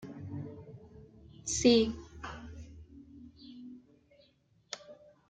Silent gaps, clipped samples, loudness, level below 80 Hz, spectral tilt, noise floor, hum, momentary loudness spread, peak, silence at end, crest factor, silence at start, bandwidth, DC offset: none; under 0.1%; -31 LUFS; -58 dBFS; -4 dB/octave; -68 dBFS; none; 28 LU; -12 dBFS; 0.35 s; 24 dB; 0 s; 9.6 kHz; under 0.1%